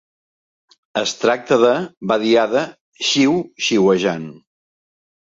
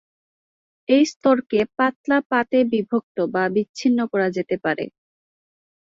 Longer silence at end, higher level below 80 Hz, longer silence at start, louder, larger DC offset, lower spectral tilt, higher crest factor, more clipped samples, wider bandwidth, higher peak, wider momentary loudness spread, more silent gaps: about the same, 1 s vs 1.05 s; about the same, -62 dBFS vs -64 dBFS; about the same, 0.95 s vs 0.9 s; first, -17 LUFS vs -21 LUFS; neither; second, -4 dB/octave vs -5.5 dB/octave; about the same, 16 dB vs 16 dB; neither; about the same, 8 kHz vs 7.6 kHz; first, -2 dBFS vs -6 dBFS; first, 9 LU vs 6 LU; second, 1.97-2.01 s, 2.81-2.92 s vs 1.16-1.21 s, 1.96-2.04 s, 2.26-2.30 s, 3.03-3.15 s, 3.69-3.74 s